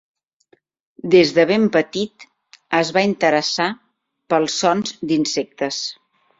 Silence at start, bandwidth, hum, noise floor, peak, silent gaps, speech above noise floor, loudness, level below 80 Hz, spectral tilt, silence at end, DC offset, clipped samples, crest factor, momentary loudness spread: 1.05 s; 7.8 kHz; none; -60 dBFS; -2 dBFS; none; 42 dB; -18 LUFS; -62 dBFS; -4 dB/octave; 0.45 s; under 0.1%; under 0.1%; 18 dB; 11 LU